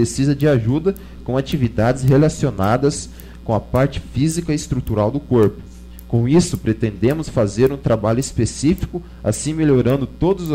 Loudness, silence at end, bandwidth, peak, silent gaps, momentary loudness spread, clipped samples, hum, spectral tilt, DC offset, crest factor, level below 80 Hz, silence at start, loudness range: -18 LUFS; 0 s; 16 kHz; -6 dBFS; none; 8 LU; under 0.1%; none; -6.5 dB/octave; under 0.1%; 12 dB; -34 dBFS; 0 s; 1 LU